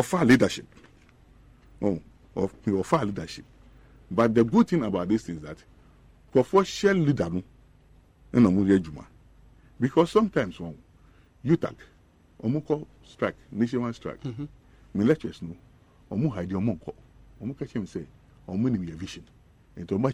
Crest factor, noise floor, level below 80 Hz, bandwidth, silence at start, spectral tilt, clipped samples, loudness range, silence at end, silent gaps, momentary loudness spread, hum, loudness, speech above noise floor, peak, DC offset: 18 dB; -57 dBFS; -54 dBFS; 13.5 kHz; 0 s; -7 dB/octave; under 0.1%; 7 LU; 0 s; none; 18 LU; none; -26 LUFS; 31 dB; -8 dBFS; under 0.1%